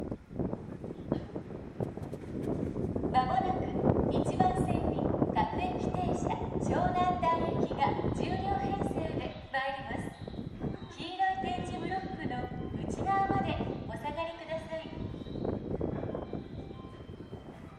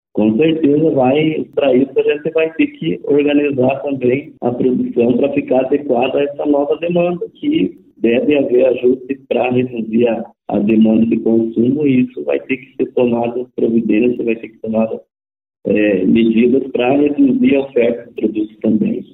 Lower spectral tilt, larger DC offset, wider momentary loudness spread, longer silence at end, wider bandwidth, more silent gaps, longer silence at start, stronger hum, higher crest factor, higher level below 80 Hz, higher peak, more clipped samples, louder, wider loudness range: second, -7 dB/octave vs -10.5 dB/octave; neither; first, 13 LU vs 8 LU; about the same, 0 s vs 0.1 s; first, 12 kHz vs 4 kHz; neither; second, 0 s vs 0.15 s; neither; first, 24 dB vs 12 dB; first, -48 dBFS vs -54 dBFS; second, -10 dBFS vs -4 dBFS; neither; second, -33 LUFS vs -15 LUFS; first, 7 LU vs 2 LU